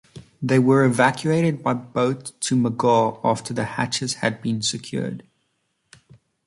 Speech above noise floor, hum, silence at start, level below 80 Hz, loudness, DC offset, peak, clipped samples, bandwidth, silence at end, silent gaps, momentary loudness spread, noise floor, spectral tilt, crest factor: 51 dB; none; 0.15 s; -60 dBFS; -21 LUFS; under 0.1%; -4 dBFS; under 0.1%; 11.5 kHz; 1.25 s; none; 11 LU; -71 dBFS; -5 dB/octave; 18 dB